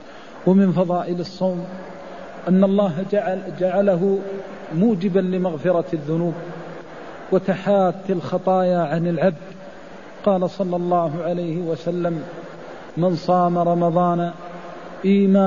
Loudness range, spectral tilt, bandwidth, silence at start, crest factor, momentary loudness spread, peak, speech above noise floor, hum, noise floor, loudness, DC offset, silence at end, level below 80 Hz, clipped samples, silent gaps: 2 LU; -9 dB/octave; 7.2 kHz; 0 s; 16 dB; 18 LU; -4 dBFS; 20 dB; none; -39 dBFS; -21 LUFS; 0.6%; 0 s; -60 dBFS; under 0.1%; none